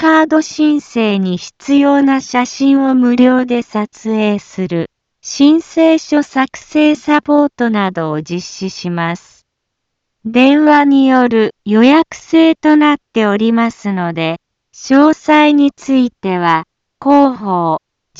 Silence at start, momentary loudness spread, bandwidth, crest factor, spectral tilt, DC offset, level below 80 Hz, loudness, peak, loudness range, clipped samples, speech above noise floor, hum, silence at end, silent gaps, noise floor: 0 s; 11 LU; 7.8 kHz; 12 dB; -5.5 dB/octave; under 0.1%; -56 dBFS; -12 LUFS; 0 dBFS; 4 LU; under 0.1%; 62 dB; none; 0.4 s; none; -73 dBFS